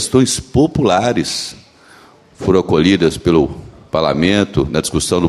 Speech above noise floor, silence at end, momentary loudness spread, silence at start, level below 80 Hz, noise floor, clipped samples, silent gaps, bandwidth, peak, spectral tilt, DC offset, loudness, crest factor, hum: 30 dB; 0 s; 9 LU; 0 s; -36 dBFS; -44 dBFS; under 0.1%; none; 13.5 kHz; 0 dBFS; -5 dB/octave; under 0.1%; -15 LUFS; 14 dB; none